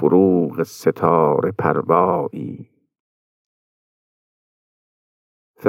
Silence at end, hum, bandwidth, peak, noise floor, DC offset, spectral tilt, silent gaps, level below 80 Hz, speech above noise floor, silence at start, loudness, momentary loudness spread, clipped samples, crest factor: 0 s; none; 16 kHz; -2 dBFS; under -90 dBFS; under 0.1%; -8 dB/octave; 3.00-5.54 s; -66 dBFS; over 73 dB; 0 s; -18 LUFS; 14 LU; under 0.1%; 20 dB